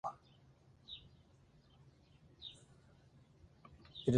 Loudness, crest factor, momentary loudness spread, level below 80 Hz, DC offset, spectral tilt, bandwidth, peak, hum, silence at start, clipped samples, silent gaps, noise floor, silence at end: -51 LUFS; 28 dB; 15 LU; -70 dBFS; under 0.1%; -7 dB/octave; 10 kHz; -18 dBFS; none; 0.05 s; under 0.1%; none; -67 dBFS; 0 s